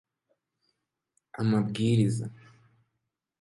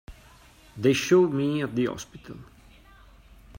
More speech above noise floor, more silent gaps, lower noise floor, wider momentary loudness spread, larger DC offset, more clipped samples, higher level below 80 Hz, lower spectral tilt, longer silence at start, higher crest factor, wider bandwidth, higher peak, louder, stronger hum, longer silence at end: first, 57 dB vs 29 dB; neither; first, -83 dBFS vs -53 dBFS; second, 15 LU vs 24 LU; neither; neither; second, -64 dBFS vs -54 dBFS; first, -7 dB/octave vs -5.5 dB/octave; first, 1.35 s vs 0.1 s; about the same, 18 dB vs 18 dB; second, 11.5 kHz vs 16 kHz; second, -12 dBFS vs -8 dBFS; second, -27 LUFS vs -24 LUFS; neither; first, 1.05 s vs 0 s